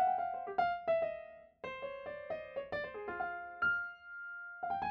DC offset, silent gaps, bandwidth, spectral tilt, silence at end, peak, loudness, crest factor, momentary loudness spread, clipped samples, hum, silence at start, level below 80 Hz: under 0.1%; none; 6.2 kHz; -6 dB/octave; 0 s; -20 dBFS; -39 LUFS; 18 dB; 12 LU; under 0.1%; none; 0 s; -72 dBFS